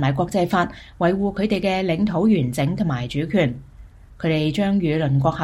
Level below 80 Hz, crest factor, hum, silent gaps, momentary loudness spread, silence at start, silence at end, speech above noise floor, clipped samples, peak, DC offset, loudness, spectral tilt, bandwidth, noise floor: -44 dBFS; 16 dB; none; none; 5 LU; 0 s; 0 s; 23 dB; under 0.1%; -6 dBFS; under 0.1%; -21 LUFS; -7 dB/octave; 14 kHz; -43 dBFS